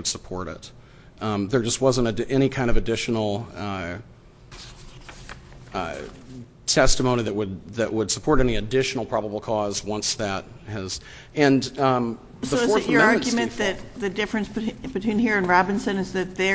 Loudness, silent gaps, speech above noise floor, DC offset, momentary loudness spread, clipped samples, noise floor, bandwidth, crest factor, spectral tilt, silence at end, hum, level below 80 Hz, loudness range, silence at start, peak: -24 LUFS; none; 21 dB; under 0.1%; 19 LU; under 0.1%; -44 dBFS; 8 kHz; 20 dB; -4.5 dB/octave; 0 s; none; -38 dBFS; 7 LU; 0 s; -2 dBFS